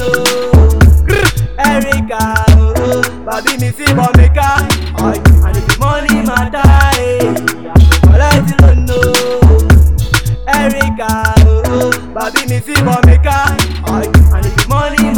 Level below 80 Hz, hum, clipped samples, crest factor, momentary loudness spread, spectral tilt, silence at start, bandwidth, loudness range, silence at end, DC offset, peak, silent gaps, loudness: -12 dBFS; none; 2%; 8 dB; 7 LU; -5.5 dB/octave; 0 s; 18.5 kHz; 2 LU; 0 s; 3%; 0 dBFS; none; -10 LUFS